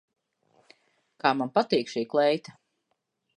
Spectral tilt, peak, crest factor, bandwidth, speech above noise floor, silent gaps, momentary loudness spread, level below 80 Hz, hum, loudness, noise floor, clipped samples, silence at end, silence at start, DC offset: -5 dB/octave; -8 dBFS; 22 dB; 10.5 kHz; 53 dB; none; 4 LU; -76 dBFS; none; -26 LUFS; -78 dBFS; under 0.1%; 0.9 s; 1.25 s; under 0.1%